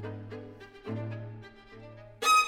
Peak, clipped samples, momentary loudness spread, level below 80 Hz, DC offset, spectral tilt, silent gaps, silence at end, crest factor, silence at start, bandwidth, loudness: -14 dBFS; under 0.1%; 19 LU; -62 dBFS; under 0.1%; -3 dB/octave; none; 0 s; 18 dB; 0 s; 19.5 kHz; -34 LUFS